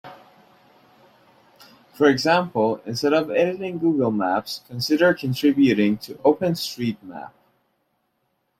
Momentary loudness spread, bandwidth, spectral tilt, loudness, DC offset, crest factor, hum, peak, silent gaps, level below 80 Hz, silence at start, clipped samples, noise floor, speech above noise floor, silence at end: 10 LU; 15.5 kHz; -5.5 dB/octave; -21 LUFS; under 0.1%; 18 dB; none; -4 dBFS; none; -64 dBFS; 0.05 s; under 0.1%; -72 dBFS; 51 dB; 1.3 s